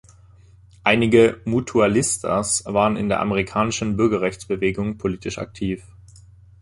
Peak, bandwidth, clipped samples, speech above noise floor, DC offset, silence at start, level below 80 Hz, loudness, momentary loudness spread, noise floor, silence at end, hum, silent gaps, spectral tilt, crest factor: -2 dBFS; 12 kHz; under 0.1%; 29 dB; under 0.1%; 0.85 s; -46 dBFS; -20 LUFS; 12 LU; -49 dBFS; 0.8 s; none; none; -4.5 dB/octave; 20 dB